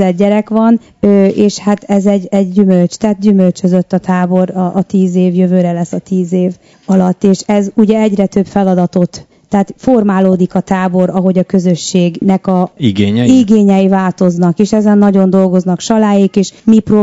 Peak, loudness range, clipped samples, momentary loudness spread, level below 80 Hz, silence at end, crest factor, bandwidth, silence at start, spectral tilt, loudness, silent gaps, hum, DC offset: 0 dBFS; 3 LU; 1%; 5 LU; -48 dBFS; 0 s; 10 dB; 8 kHz; 0 s; -7.5 dB/octave; -11 LUFS; none; none; 0.1%